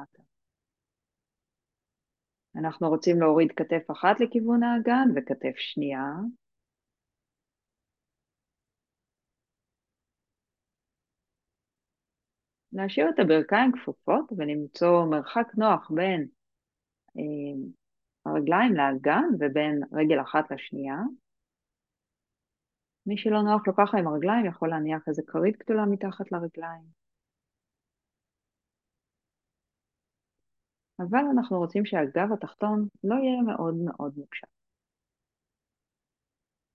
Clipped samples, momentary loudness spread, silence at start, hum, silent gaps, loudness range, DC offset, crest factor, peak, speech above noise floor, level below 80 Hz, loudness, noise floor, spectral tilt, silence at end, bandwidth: under 0.1%; 13 LU; 0 s; none; none; 10 LU; under 0.1%; 22 dB; -6 dBFS; 64 dB; -80 dBFS; -26 LUFS; -90 dBFS; -7.5 dB/octave; 2.35 s; 6.8 kHz